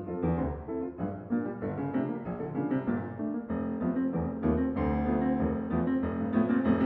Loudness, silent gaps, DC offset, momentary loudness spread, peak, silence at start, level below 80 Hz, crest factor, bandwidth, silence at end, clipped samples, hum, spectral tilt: -31 LUFS; none; under 0.1%; 7 LU; -14 dBFS; 0 s; -48 dBFS; 16 dB; 4 kHz; 0 s; under 0.1%; none; -12 dB/octave